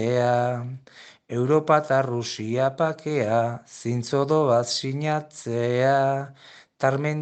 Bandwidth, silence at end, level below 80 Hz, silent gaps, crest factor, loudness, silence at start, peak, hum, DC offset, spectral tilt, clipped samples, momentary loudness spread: 9 kHz; 0 s; -70 dBFS; none; 20 dB; -24 LUFS; 0 s; -4 dBFS; none; under 0.1%; -6 dB/octave; under 0.1%; 10 LU